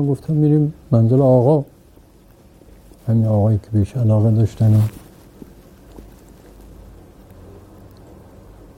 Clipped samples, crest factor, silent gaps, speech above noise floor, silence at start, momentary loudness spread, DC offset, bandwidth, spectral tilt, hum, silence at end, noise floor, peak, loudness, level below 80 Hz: under 0.1%; 18 dB; none; 33 dB; 0 s; 8 LU; under 0.1%; 9 kHz; -10.5 dB/octave; none; 2.75 s; -48 dBFS; -2 dBFS; -16 LUFS; -46 dBFS